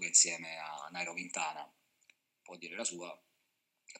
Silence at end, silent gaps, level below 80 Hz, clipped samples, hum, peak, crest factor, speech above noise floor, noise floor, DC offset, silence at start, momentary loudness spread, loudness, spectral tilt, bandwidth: 0 s; none; under -90 dBFS; under 0.1%; none; -12 dBFS; 26 dB; 40 dB; -82 dBFS; under 0.1%; 0 s; 24 LU; -34 LUFS; 0.5 dB/octave; 16.5 kHz